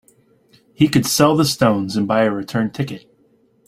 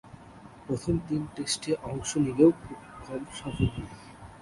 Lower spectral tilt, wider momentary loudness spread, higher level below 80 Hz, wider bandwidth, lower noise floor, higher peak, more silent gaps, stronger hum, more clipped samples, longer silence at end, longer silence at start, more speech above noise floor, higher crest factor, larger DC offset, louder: about the same, -5 dB/octave vs -5.5 dB/octave; second, 11 LU vs 25 LU; about the same, -52 dBFS vs -48 dBFS; first, 16 kHz vs 11.5 kHz; first, -57 dBFS vs -49 dBFS; first, -2 dBFS vs -8 dBFS; neither; neither; neither; first, 0.7 s vs 0 s; first, 0.8 s vs 0.05 s; first, 41 dB vs 21 dB; about the same, 18 dB vs 22 dB; neither; first, -17 LUFS vs -29 LUFS